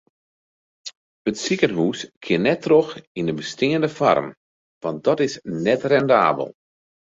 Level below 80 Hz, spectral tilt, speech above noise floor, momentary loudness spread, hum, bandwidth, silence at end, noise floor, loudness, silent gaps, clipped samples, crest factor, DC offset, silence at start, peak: -62 dBFS; -5.5 dB/octave; over 70 dB; 15 LU; none; 7.8 kHz; 0.6 s; under -90 dBFS; -21 LUFS; 0.97-1.25 s, 2.17-2.21 s, 3.07-3.15 s, 4.37-4.81 s; under 0.1%; 20 dB; under 0.1%; 0.85 s; -2 dBFS